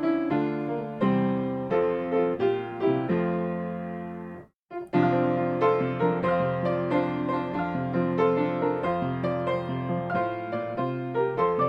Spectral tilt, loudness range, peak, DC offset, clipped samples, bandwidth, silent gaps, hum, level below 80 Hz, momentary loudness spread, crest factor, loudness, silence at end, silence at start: -9.5 dB/octave; 2 LU; -12 dBFS; under 0.1%; under 0.1%; 5.8 kHz; 4.56-4.67 s; none; -60 dBFS; 8 LU; 16 dB; -27 LUFS; 0 s; 0 s